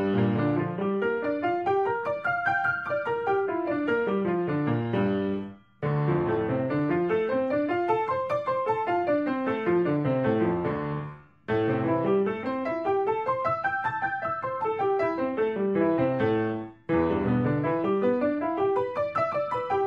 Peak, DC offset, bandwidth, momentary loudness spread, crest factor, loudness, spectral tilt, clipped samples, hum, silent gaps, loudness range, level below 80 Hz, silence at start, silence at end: -12 dBFS; under 0.1%; 6.6 kHz; 4 LU; 14 dB; -27 LUFS; -9 dB/octave; under 0.1%; none; none; 1 LU; -58 dBFS; 0 s; 0 s